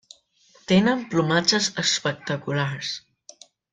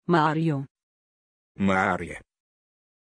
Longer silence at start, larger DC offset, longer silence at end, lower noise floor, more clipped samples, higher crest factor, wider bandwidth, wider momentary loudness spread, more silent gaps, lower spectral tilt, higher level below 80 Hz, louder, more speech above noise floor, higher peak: first, 0.7 s vs 0.1 s; neither; second, 0.75 s vs 0.9 s; second, -58 dBFS vs under -90 dBFS; neither; about the same, 20 dB vs 20 dB; about the same, 9.6 kHz vs 10.5 kHz; second, 11 LU vs 18 LU; second, none vs 0.71-0.75 s, 0.83-1.55 s; second, -4 dB/octave vs -7 dB/octave; about the same, -60 dBFS vs -60 dBFS; first, -22 LUFS vs -25 LUFS; second, 36 dB vs over 66 dB; about the same, -6 dBFS vs -8 dBFS